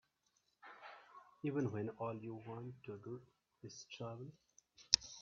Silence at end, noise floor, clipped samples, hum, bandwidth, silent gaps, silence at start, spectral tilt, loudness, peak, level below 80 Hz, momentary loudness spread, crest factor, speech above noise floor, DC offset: 0 s; -81 dBFS; under 0.1%; none; 7.2 kHz; none; 0.65 s; -4 dB/octave; -43 LUFS; -8 dBFS; -76 dBFS; 24 LU; 36 dB; 36 dB; under 0.1%